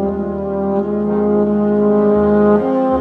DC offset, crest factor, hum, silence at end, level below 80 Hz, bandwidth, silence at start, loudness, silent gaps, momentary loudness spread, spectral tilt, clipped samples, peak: under 0.1%; 12 dB; none; 0 s; -40 dBFS; 3.8 kHz; 0 s; -15 LUFS; none; 7 LU; -11 dB/octave; under 0.1%; -4 dBFS